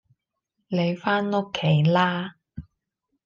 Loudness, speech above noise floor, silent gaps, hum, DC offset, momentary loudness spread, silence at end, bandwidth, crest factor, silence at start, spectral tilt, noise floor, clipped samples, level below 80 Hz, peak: -23 LUFS; 57 dB; none; none; under 0.1%; 23 LU; 0.65 s; 7 kHz; 16 dB; 0.7 s; -7.5 dB/octave; -79 dBFS; under 0.1%; -58 dBFS; -8 dBFS